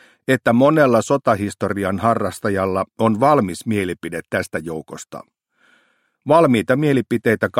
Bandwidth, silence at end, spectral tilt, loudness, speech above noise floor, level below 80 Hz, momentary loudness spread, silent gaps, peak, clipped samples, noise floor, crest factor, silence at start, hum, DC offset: 16 kHz; 0 s; -6.5 dB/octave; -18 LUFS; 44 dB; -56 dBFS; 15 LU; none; -2 dBFS; under 0.1%; -62 dBFS; 18 dB; 0.3 s; none; under 0.1%